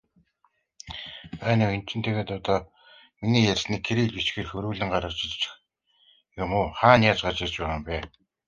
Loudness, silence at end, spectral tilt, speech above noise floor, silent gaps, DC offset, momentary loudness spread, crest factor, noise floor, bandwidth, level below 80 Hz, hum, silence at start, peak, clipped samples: -25 LUFS; 0.4 s; -5.5 dB/octave; 45 dB; none; under 0.1%; 16 LU; 24 dB; -70 dBFS; 7.4 kHz; -46 dBFS; none; 0.85 s; -2 dBFS; under 0.1%